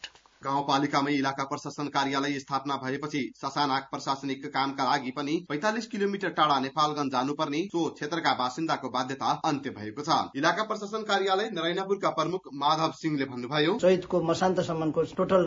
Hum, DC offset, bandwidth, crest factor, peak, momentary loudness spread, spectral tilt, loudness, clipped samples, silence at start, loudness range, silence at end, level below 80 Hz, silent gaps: none; under 0.1%; 7.8 kHz; 20 dB; -8 dBFS; 6 LU; -5 dB/octave; -28 LUFS; under 0.1%; 0.05 s; 3 LU; 0 s; -66 dBFS; none